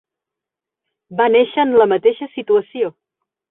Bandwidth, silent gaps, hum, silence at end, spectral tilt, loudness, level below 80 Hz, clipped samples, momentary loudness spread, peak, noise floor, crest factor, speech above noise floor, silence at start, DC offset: 3.9 kHz; none; none; 0.6 s; -10 dB/octave; -16 LUFS; -64 dBFS; under 0.1%; 11 LU; -2 dBFS; -85 dBFS; 16 dB; 70 dB; 1.1 s; under 0.1%